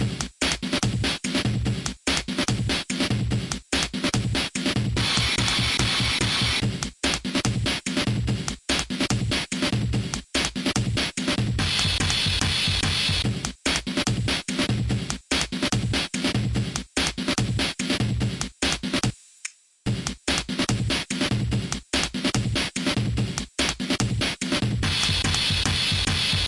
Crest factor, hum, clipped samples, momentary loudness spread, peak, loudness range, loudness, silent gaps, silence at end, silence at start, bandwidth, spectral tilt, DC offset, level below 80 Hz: 20 dB; none; under 0.1%; 6 LU; -6 dBFS; 3 LU; -24 LUFS; none; 0 s; 0 s; 11.5 kHz; -3.5 dB/octave; under 0.1%; -38 dBFS